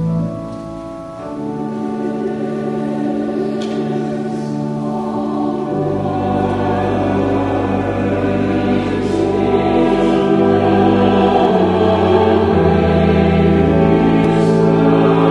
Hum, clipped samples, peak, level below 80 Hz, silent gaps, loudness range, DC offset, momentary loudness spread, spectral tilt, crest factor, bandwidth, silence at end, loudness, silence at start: none; under 0.1%; 0 dBFS; -36 dBFS; none; 8 LU; under 0.1%; 9 LU; -8 dB/octave; 14 dB; 11 kHz; 0 s; -15 LUFS; 0 s